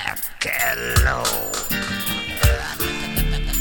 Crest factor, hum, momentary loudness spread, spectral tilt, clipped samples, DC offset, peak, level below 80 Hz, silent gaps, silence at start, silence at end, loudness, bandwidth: 18 dB; none; 5 LU; -3 dB/octave; under 0.1%; under 0.1%; -4 dBFS; -26 dBFS; none; 0 s; 0 s; -21 LUFS; 17.5 kHz